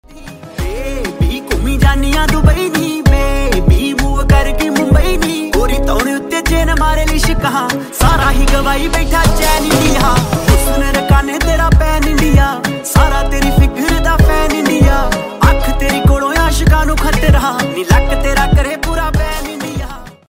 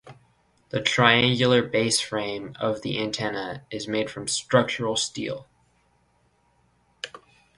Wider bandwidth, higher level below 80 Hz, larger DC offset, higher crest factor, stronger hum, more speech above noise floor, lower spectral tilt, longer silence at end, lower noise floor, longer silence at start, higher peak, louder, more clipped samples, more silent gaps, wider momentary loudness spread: first, 16.5 kHz vs 11.5 kHz; first, -14 dBFS vs -60 dBFS; first, 0.3% vs under 0.1%; second, 12 dB vs 24 dB; neither; second, 21 dB vs 41 dB; first, -5 dB/octave vs -3.5 dB/octave; second, 0.2 s vs 0.4 s; second, -31 dBFS vs -66 dBFS; about the same, 0.15 s vs 0.05 s; about the same, 0 dBFS vs -2 dBFS; first, -13 LUFS vs -24 LUFS; neither; neither; second, 6 LU vs 15 LU